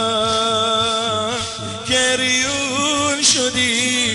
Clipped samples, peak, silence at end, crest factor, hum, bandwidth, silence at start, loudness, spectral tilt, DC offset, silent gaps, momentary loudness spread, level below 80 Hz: under 0.1%; -4 dBFS; 0 s; 14 dB; none; 11.5 kHz; 0 s; -16 LUFS; -1.5 dB/octave; under 0.1%; none; 7 LU; -46 dBFS